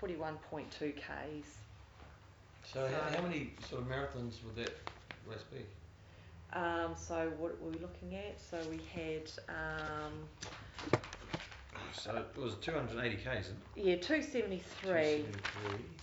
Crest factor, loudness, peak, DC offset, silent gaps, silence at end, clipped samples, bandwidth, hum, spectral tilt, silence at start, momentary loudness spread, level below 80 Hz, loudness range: 26 dB; -41 LUFS; -16 dBFS; under 0.1%; none; 0 s; under 0.1%; over 20 kHz; none; -5.5 dB/octave; 0 s; 17 LU; -58 dBFS; 7 LU